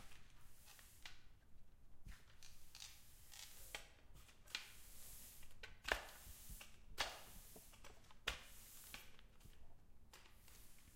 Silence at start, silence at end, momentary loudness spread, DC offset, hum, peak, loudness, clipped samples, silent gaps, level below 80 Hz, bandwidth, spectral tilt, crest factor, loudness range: 0 s; 0 s; 20 LU; under 0.1%; none; -20 dBFS; -53 LUFS; under 0.1%; none; -64 dBFS; 16 kHz; -1.5 dB/octave; 34 dB; 10 LU